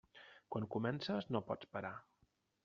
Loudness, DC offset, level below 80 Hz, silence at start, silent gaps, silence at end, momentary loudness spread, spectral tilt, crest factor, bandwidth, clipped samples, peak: -43 LUFS; under 0.1%; -78 dBFS; 0.15 s; none; 0.65 s; 16 LU; -5 dB/octave; 22 dB; 7.4 kHz; under 0.1%; -22 dBFS